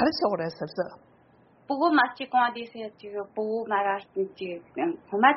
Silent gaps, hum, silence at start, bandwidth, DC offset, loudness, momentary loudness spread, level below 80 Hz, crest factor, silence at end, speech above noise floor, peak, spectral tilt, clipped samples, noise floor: none; none; 0 s; 5.8 kHz; under 0.1%; -28 LUFS; 14 LU; -70 dBFS; 22 dB; 0 s; 32 dB; -6 dBFS; -2.5 dB/octave; under 0.1%; -59 dBFS